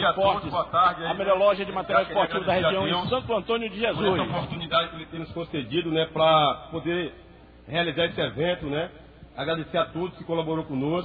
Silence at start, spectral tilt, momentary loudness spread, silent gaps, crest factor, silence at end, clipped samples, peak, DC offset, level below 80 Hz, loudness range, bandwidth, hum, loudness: 0 s; -8.5 dB/octave; 10 LU; none; 16 dB; 0 s; under 0.1%; -8 dBFS; under 0.1%; -52 dBFS; 5 LU; 5 kHz; none; -25 LUFS